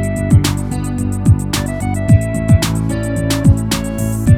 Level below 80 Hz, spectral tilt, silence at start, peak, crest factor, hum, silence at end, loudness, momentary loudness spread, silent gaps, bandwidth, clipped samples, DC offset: -24 dBFS; -6 dB/octave; 0 s; 0 dBFS; 14 dB; none; 0 s; -15 LUFS; 6 LU; none; 16.5 kHz; under 0.1%; under 0.1%